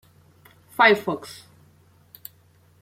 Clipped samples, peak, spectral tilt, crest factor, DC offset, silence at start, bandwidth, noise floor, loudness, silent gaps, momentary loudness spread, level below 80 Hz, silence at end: under 0.1%; -4 dBFS; -4 dB/octave; 22 dB; under 0.1%; 0.8 s; 16.5 kHz; -57 dBFS; -20 LUFS; none; 26 LU; -70 dBFS; 1.5 s